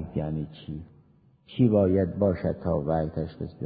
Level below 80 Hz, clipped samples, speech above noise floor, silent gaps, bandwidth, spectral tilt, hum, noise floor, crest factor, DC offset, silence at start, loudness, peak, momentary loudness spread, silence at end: -44 dBFS; under 0.1%; 33 dB; none; 4.9 kHz; -12.5 dB/octave; none; -59 dBFS; 18 dB; under 0.1%; 0 s; -26 LUFS; -10 dBFS; 18 LU; 0 s